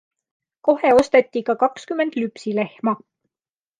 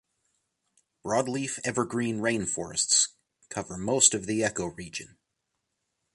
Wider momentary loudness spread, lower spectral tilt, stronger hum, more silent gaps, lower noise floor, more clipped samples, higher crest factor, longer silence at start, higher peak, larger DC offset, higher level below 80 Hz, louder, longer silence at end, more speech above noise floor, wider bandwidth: second, 10 LU vs 17 LU; first, -5.5 dB/octave vs -2.5 dB/octave; neither; neither; first, under -90 dBFS vs -81 dBFS; neither; second, 18 dB vs 24 dB; second, 0.65 s vs 1.05 s; first, -2 dBFS vs -6 dBFS; neither; about the same, -58 dBFS vs -60 dBFS; first, -20 LUFS vs -26 LUFS; second, 0.85 s vs 1.1 s; first, over 71 dB vs 53 dB; about the same, 11 kHz vs 11.5 kHz